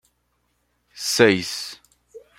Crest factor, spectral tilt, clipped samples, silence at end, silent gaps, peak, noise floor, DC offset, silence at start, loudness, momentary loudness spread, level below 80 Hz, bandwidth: 22 dB; -3.5 dB/octave; under 0.1%; 0.2 s; none; -2 dBFS; -70 dBFS; under 0.1%; 0.95 s; -20 LUFS; 14 LU; -64 dBFS; 16.5 kHz